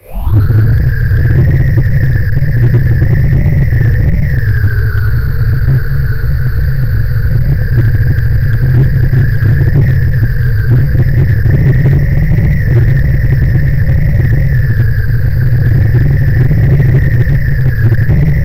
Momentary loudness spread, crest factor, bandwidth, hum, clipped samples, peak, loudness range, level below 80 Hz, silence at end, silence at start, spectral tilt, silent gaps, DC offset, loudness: 4 LU; 8 dB; 15.5 kHz; none; under 0.1%; -2 dBFS; 2 LU; -14 dBFS; 0 s; 0 s; -10 dB/octave; none; 10%; -11 LUFS